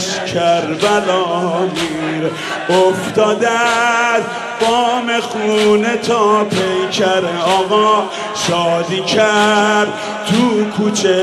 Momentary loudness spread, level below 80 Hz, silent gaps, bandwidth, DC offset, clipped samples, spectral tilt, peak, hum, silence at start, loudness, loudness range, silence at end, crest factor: 6 LU; -54 dBFS; none; 13 kHz; under 0.1%; under 0.1%; -4 dB/octave; -2 dBFS; none; 0 s; -14 LUFS; 1 LU; 0 s; 12 dB